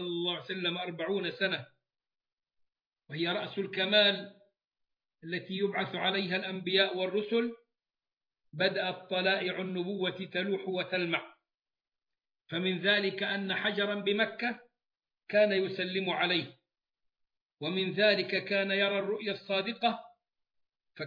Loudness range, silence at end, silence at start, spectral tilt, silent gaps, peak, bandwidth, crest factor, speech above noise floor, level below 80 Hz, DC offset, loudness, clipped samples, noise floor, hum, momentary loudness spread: 3 LU; 0 s; 0 s; -7 dB/octave; 2.33-2.37 s, 2.87-2.91 s, 4.67-4.71 s, 17.42-17.49 s; -12 dBFS; 5.2 kHz; 22 dB; over 59 dB; under -90 dBFS; under 0.1%; -31 LUFS; under 0.1%; under -90 dBFS; none; 9 LU